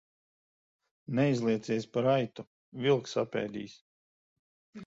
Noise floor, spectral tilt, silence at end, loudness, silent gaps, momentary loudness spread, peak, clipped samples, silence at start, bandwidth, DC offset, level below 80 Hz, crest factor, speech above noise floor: under -90 dBFS; -6.5 dB/octave; 0 s; -31 LUFS; 2.47-2.72 s, 3.81-4.73 s; 16 LU; -14 dBFS; under 0.1%; 1.1 s; 8 kHz; under 0.1%; -72 dBFS; 18 dB; over 60 dB